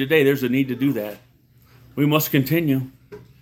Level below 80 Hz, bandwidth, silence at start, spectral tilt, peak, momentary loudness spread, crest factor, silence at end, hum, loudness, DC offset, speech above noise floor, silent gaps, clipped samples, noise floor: -58 dBFS; 18 kHz; 0 s; -6 dB/octave; -2 dBFS; 14 LU; 20 dB; 0.25 s; none; -20 LUFS; under 0.1%; 34 dB; none; under 0.1%; -54 dBFS